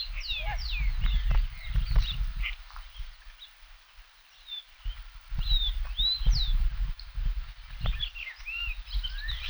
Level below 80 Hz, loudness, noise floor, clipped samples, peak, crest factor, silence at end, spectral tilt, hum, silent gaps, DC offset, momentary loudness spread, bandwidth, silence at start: -30 dBFS; -32 LUFS; -54 dBFS; under 0.1%; -12 dBFS; 18 dB; 0 s; -4 dB/octave; none; none; under 0.1%; 20 LU; over 20 kHz; 0 s